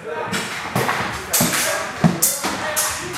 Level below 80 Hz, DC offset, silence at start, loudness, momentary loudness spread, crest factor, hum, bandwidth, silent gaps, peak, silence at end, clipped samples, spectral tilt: -48 dBFS; under 0.1%; 0 s; -19 LUFS; 7 LU; 20 dB; none; 16 kHz; none; 0 dBFS; 0 s; under 0.1%; -3 dB/octave